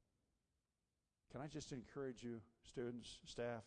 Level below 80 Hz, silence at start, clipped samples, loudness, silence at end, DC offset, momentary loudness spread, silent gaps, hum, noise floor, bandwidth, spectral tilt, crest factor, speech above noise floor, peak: -74 dBFS; 1.3 s; under 0.1%; -52 LUFS; 0 s; under 0.1%; 7 LU; none; none; under -90 dBFS; 10 kHz; -5 dB/octave; 16 dB; over 39 dB; -36 dBFS